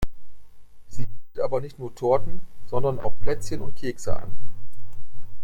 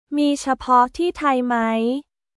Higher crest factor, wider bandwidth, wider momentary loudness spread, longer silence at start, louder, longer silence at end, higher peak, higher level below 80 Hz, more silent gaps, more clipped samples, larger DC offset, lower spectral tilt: second, 10 dB vs 16 dB; first, 16.5 kHz vs 12 kHz; first, 25 LU vs 6 LU; about the same, 0 s vs 0.1 s; second, -29 LUFS vs -20 LUFS; second, 0 s vs 0.35 s; about the same, -6 dBFS vs -4 dBFS; first, -40 dBFS vs -52 dBFS; neither; neither; neither; first, -6.5 dB/octave vs -4 dB/octave